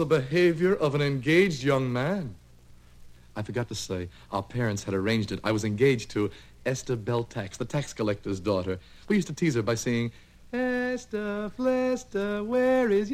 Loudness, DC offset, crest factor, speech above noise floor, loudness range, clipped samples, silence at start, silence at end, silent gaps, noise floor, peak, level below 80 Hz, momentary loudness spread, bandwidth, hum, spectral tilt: -27 LUFS; under 0.1%; 16 dB; 25 dB; 4 LU; under 0.1%; 0 s; 0 s; none; -52 dBFS; -10 dBFS; -54 dBFS; 11 LU; 15.5 kHz; 60 Hz at -55 dBFS; -6 dB/octave